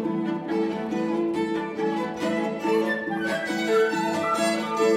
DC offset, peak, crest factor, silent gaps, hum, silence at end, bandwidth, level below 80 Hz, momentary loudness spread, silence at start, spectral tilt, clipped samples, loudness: under 0.1%; -10 dBFS; 14 dB; none; none; 0 s; 15 kHz; -68 dBFS; 5 LU; 0 s; -5 dB/octave; under 0.1%; -25 LUFS